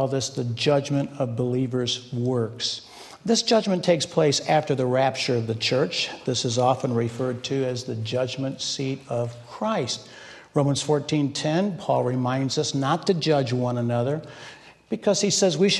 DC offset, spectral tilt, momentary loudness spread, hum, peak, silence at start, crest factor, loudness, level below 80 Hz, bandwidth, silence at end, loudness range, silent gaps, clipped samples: under 0.1%; -4.5 dB/octave; 8 LU; none; -6 dBFS; 0 s; 18 dB; -24 LUFS; -64 dBFS; 12 kHz; 0 s; 4 LU; none; under 0.1%